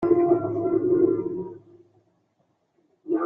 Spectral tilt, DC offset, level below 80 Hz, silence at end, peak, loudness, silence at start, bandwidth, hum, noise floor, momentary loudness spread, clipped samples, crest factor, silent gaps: -12 dB/octave; under 0.1%; -62 dBFS; 0 s; -8 dBFS; -23 LUFS; 0 s; 2.6 kHz; none; -70 dBFS; 16 LU; under 0.1%; 18 dB; none